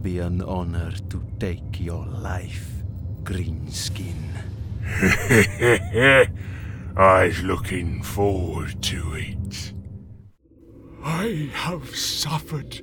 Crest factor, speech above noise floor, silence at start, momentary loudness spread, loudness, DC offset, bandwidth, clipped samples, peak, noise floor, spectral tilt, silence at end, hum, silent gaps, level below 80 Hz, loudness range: 22 dB; 27 dB; 0 s; 16 LU; -23 LUFS; under 0.1%; 19.5 kHz; under 0.1%; -2 dBFS; -50 dBFS; -5 dB/octave; 0 s; none; none; -38 dBFS; 11 LU